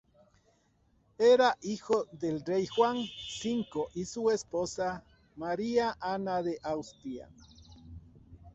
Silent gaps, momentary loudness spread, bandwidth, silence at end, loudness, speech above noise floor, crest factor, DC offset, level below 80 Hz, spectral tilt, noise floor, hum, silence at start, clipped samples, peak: none; 17 LU; 8.2 kHz; 0.05 s; -31 LUFS; 39 dB; 18 dB; under 0.1%; -62 dBFS; -4.5 dB/octave; -69 dBFS; none; 1.2 s; under 0.1%; -14 dBFS